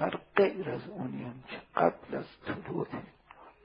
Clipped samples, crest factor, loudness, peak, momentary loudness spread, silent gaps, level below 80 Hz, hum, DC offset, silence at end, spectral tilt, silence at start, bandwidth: under 0.1%; 26 dB; -33 LUFS; -8 dBFS; 14 LU; none; -66 dBFS; none; under 0.1%; 0.15 s; -10 dB/octave; 0 s; 5.4 kHz